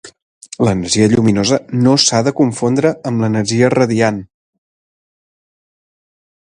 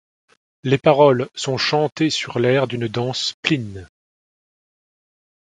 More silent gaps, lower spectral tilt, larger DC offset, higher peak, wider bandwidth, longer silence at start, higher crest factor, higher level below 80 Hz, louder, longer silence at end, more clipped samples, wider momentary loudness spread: first, 0.22-0.41 s vs 1.92-1.96 s, 3.34-3.43 s; about the same, -5 dB/octave vs -5 dB/octave; neither; about the same, 0 dBFS vs 0 dBFS; about the same, 11 kHz vs 10.5 kHz; second, 0.05 s vs 0.65 s; about the same, 16 dB vs 20 dB; first, -46 dBFS vs -56 dBFS; first, -14 LUFS vs -19 LUFS; first, 2.25 s vs 1.6 s; neither; second, 6 LU vs 10 LU